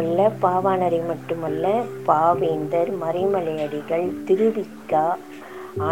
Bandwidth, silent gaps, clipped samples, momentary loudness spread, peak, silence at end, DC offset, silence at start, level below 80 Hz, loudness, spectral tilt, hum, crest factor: 17 kHz; none; under 0.1%; 8 LU; -4 dBFS; 0 s; 0.3%; 0 s; -66 dBFS; -22 LUFS; -7.5 dB/octave; none; 18 dB